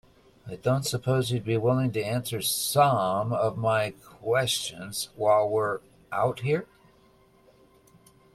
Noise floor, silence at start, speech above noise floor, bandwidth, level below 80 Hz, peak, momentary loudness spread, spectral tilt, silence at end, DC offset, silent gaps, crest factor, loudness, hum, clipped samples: -59 dBFS; 0.45 s; 33 dB; 15.5 kHz; -62 dBFS; -8 dBFS; 11 LU; -4.5 dB/octave; 1.7 s; under 0.1%; none; 20 dB; -26 LUFS; none; under 0.1%